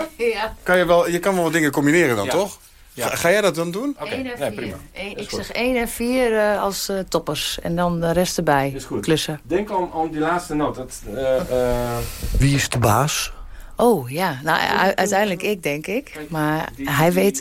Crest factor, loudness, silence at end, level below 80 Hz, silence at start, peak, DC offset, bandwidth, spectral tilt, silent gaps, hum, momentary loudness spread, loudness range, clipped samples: 16 dB; -20 LUFS; 0 s; -38 dBFS; 0 s; -4 dBFS; under 0.1%; 16.5 kHz; -4.5 dB/octave; none; none; 10 LU; 4 LU; under 0.1%